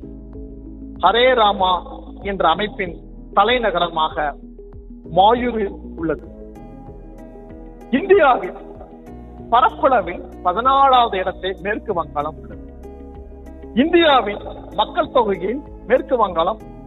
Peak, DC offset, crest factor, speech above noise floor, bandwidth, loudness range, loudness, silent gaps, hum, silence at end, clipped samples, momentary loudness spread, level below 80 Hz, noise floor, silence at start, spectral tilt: 0 dBFS; under 0.1%; 18 dB; 20 dB; 4.2 kHz; 4 LU; -18 LUFS; none; none; 0 s; under 0.1%; 25 LU; -38 dBFS; -37 dBFS; 0 s; -7.5 dB/octave